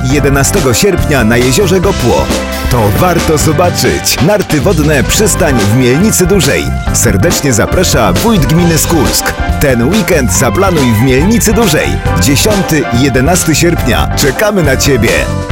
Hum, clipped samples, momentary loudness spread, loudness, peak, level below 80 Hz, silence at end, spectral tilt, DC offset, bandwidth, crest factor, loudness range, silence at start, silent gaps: none; under 0.1%; 3 LU; -9 LUFS; 0 dBFS; -20 dBFS; 0 s; -4.5 dB/octave; under 0.1%; 17 kHz; 8 dB; 1 LU; 0 s; none